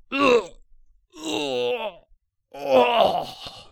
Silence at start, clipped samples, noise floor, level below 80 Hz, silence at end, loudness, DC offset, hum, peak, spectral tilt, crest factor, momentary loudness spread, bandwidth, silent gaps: 0.1 s; under 0.1%; -60 dBFS; -56 dBFS; 0.1 s; -22 LUFS; under 0.1%; none; -4 dBFS; -3.5 dB/octave; 20 dB; 17 LU; 17.5 kHz; none